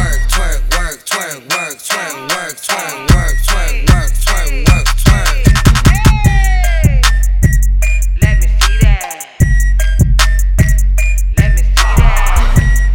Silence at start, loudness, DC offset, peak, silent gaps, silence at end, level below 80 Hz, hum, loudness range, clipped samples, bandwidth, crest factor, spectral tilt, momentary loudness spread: 0 s; -13 LUFS; 0.4%; 0 dBFS; none; 0 s; -12 dBFS; none; 4 LU; under 0.1%; 17 kHz; 10 dB; -4.5 dB/octave; 7 LU